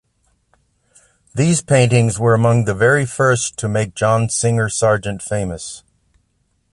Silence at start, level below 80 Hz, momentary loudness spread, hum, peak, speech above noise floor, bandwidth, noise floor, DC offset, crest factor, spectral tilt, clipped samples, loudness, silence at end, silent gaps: 1.35 s; -46 dBFS; 10 LU; none; -2 dBFS; 49 dB; 11.5 kHz; -64 dBFS; under 0.1%; 16 dB; -5 dB/octave; under 0.1%; -16 LUFS; 0.95 s; none